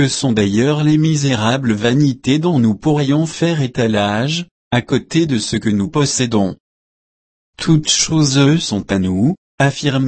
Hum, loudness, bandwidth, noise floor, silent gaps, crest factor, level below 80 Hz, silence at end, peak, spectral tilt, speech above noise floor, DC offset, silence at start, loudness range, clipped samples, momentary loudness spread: none; -15 LUFS; 8.8 kHz; under -90 dBFS; 4.51-4.71 s, 6.60-7.53 s, 9.38-9.58 s; 14 dB; -46 dBFS; 0 s; 0 dBFS; -5 dB/octave; over 75 dB; under 0.1%; 0 s; 3 LU; under 0.1%; 5 LU